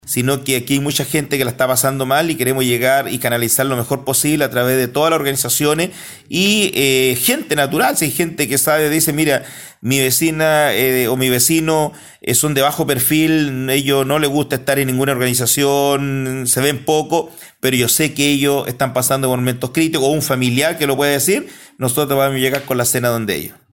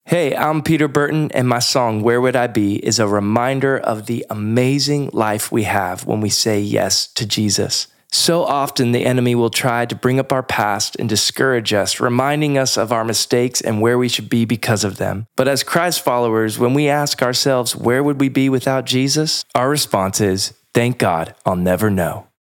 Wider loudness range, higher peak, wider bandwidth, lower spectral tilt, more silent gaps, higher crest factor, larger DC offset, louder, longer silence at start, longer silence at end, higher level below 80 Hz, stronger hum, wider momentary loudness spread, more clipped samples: about the same, 2 LU vs 1 LU; about the same, 0 dBFS vs 0 dBFS; about the same, 17 kHz vs 18 kHz; about the same, -3.5 dB/octave vs -4 dB/octave; neither; about the same, 16 dB vs 16 dB; neither; about the same, -15 LUFS vs -17 LUFS; about the same, 0.05 s vs 0.05 s; about the same, 0.2 s vs 0.2 s; first, -50 dBFS vs -60 dBFS; neither; about the same, 6 LU vs 4 LU; neither